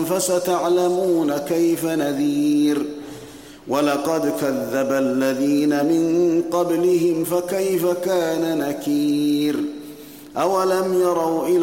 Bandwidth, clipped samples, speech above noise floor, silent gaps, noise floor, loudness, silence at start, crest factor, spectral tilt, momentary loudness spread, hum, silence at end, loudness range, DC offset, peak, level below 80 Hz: 17 kHz; under 0.1%; 21 dB; none; -40 dBFS; -20 LUFS; 0 s; 12 dB; -5 dB/octave; 8 LU; none; 0 s; 2 LU; 0.1%; -6 dBFS; -62 dBFS